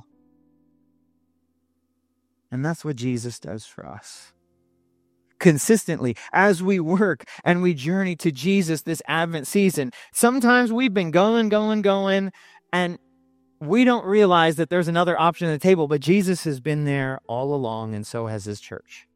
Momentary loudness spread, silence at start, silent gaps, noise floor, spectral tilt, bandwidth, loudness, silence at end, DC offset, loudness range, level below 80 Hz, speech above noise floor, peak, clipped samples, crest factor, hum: 15 LU; 2.5 s; none; -72 dBFS; -5.5 dB/octave; 16 kHz; -21 LUFS; 0.15 s; under 0.1%; 12 LU; -66 dBFS; 51 dB; 0 dBFS; under 0.1%; 22 dB; none